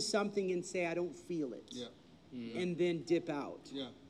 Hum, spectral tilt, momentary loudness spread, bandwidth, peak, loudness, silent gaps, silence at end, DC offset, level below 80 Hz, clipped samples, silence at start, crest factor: none; -5 dB/octave; 13 LU; 12 kHz; -20 dBFS; -38 LUFS; none; 0 s; under 0.1%; -76 dBFS; under 0.1%; 0 s; 18 dB